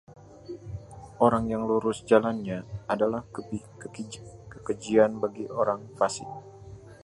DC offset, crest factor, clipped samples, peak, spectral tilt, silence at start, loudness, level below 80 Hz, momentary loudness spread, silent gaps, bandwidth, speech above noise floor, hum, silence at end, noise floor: under 0.1%; 24 dB; under 0.1%; -6 dBFS; -6 dB/octave; 0.1 s; -27 LUFS; -54 dBFS; 21 LU; none; 11.5 kHz; 20 dB; none; 0.1 s; -46 dBFS